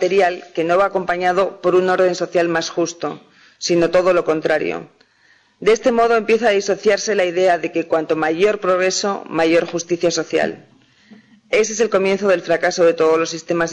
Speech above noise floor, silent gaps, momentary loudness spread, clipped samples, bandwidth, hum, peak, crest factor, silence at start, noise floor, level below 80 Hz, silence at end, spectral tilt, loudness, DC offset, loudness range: 39 dB; none; 7 LU; under 0.1%; 10 kHz; none; -6 dBFS; 12 dB; 0 s; -55 dBFS; -56 dBFS; 0 s; -4 dB/octave; -17 LUFS; under 0.1%; 3 LU